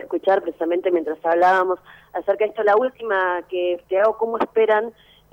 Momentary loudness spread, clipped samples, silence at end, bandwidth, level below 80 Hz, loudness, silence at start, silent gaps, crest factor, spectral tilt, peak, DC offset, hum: 7 LU; under 0.1%; 0.4 s; 15.5 kHz; -64 dBFS; -20 LUFS; 0 s; none; 12 dB; -5.5 dB/octave; -8 dBFS; under 0.1%; none